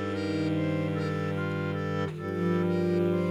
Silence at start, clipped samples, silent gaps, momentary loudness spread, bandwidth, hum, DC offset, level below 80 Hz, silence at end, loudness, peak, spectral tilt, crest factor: 0 s; under 0.1%; none; 4 LU; 11 kHz; none; under 0.1%; -70 dBFS; 0 s; -29 LUFS; -16 dBFS; -8 dB/octave; 12 dB